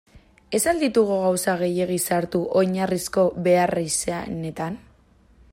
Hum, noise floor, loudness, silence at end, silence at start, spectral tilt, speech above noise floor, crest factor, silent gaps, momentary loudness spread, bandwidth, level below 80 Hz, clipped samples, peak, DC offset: none; -56 dBFS; -22 LUFS; 0.75 s; 0.15 s; -4.5 dB/octave; 34 dB; 16 dB; none; 10 LU; 16 kHz; -54 dBFS; under 0.1%; -6 dBFS; under 0.1%